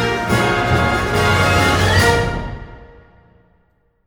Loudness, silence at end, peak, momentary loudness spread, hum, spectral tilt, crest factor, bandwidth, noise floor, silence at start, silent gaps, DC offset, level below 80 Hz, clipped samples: -15 LUFS; 1.2 s; -2 dBFS; 12 LU; none; -5 dB/octave; 16 dB; 19.5 kHz; -60 dBFS; 0 s; none; under 0.1%; -30 dBFS; under 0.1%